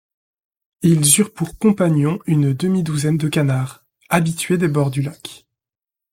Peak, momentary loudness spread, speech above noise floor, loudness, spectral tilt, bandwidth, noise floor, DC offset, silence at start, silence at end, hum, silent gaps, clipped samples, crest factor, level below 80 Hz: 0 dBFS; 10 LU; 71 dB; -18 LUFS; -5 dB/octave; 16.5 kHz; -88 dBFS; under 0.1%; 0.8 s; 0.75 s; none; none; under 0.1%; 18 dB; -52 dBFS